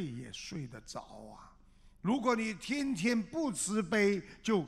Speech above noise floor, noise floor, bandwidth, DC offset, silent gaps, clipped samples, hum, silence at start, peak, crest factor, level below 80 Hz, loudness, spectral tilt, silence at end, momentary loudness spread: 26 dB; -60 dBFS; 14 kHz; under 0.1%; none; under 0.1%; none; 0 s; -18 dBFS; 18 dB; -62 dBFS; -34 LUFS; -4.5 dB/octave; 0 s; 16 LU